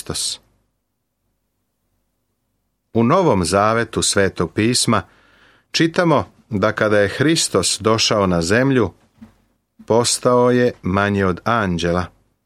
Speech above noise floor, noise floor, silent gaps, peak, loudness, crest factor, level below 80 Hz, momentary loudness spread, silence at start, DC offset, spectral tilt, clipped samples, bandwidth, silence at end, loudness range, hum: 56 dB; -73 dBFS; none; -2 dBFS; -17 LUFS; 18 dB; -48 dBFS; 7 LU; 0.1 s; under 0.1%; -4 dB/octave; under 0.1%; 15.5 kHz; 0.4 s; 4 LU; none